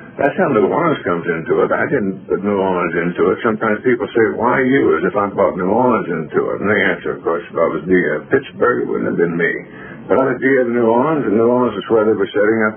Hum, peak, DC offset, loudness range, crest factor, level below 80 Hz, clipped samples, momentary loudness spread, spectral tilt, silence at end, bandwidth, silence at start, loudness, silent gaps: none; 0 dBFS; under 0.1%; 2 LU; 16 dB; -52 dBFS; under 0.1%; 5 LU; -2 dB/octave; 0 s; 3.5 kHz; 0 s; -16 LUFS; none